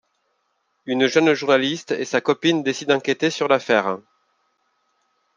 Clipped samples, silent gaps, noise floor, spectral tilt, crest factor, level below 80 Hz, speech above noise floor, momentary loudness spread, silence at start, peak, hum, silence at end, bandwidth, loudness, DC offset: under 0.1%; none; -70 dBFS; -4.5 dB/octave; 20 dB; -72 dBFS; 51 dB; 9 LU; 0.85 s; -2 dBFS; none; 1.4 s; 9.8 kHz; -20 LUFS; under 0.1%